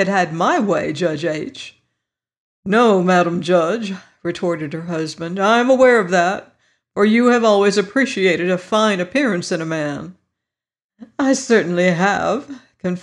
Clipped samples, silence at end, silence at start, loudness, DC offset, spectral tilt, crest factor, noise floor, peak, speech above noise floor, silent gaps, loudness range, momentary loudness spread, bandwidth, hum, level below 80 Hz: under 0.1%; 0 s; 0 s; -17 LUFS; under 0.1%; -5 dB/octave; 14 dB; -85 dBFS; -4 dBFS; 68 dB; 2.38-2.63 s, 10.84-10.89 s; 4 LU; 14 LU; 11 kHz; none; -62 dBFS